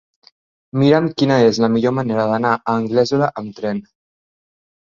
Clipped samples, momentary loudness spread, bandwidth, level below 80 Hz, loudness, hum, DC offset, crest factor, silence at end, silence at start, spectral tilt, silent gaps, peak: under 0.1%; 11 LU; 7.4 kHz; -56 dBFS; -17 LUFS; none; under 0.1%; 16 dB; 1.05 s; 0.75 s; -6.5 dB/octave; none; -2 dBFS